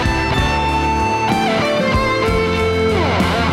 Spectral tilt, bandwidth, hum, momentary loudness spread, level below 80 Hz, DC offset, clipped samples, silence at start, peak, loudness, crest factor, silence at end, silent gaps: -5.5 dB/octave; 15.5 kHz; none; 1 LU; -26 dBFS; under 0.1%; under 0.1%; 0 s; -6 dBFS; -16 LUFS; 10 dB; 0 s; none